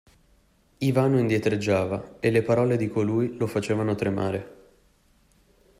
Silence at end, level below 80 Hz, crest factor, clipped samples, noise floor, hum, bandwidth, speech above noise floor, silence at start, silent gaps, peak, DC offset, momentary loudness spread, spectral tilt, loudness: 1.25 s; -58 dBFS; 18 dB; under 0.1%; -62 dBFS; none; 15.5 kHz; 38 dB; 0.8 s; none; -8 dBFS; under 0.1%; 6 LU; -7.5 dB/octave; -25 LUFS